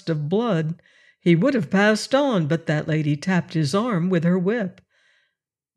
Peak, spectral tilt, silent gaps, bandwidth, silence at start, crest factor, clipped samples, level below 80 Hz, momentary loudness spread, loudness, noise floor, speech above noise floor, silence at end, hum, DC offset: -6 dBFS; -6.5 dB/octave; none; 12 kHz; 0.05 s; 16 dB; under 0.1%; -68 dBFS; 7 LU; -21 LUFS; -79 dBFS; 59 dB; 1.05 s; none; under 0.1%